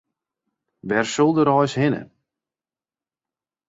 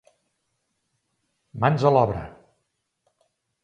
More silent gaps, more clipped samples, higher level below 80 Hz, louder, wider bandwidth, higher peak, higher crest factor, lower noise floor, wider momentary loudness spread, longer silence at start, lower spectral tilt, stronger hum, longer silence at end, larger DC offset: neither; neither; second, -62 dBFS vs -52 dBFS; about the same, -20 LUFS vs -21 LUFS; about the same, 8 kHz vs 7.8 kHz; about the same, -4 dBFS vs -4 dBFS; about the same, 20 dB vs 22 dB; first, under -90 dBFS vs -76 dBFS; second, 11 LU vs 24 LU; second, 0.85 s vs 1.55 s; second, -6 dB/octave vs -8 dB/octave; neither; first, 1.65 s vs 1.35 s; neither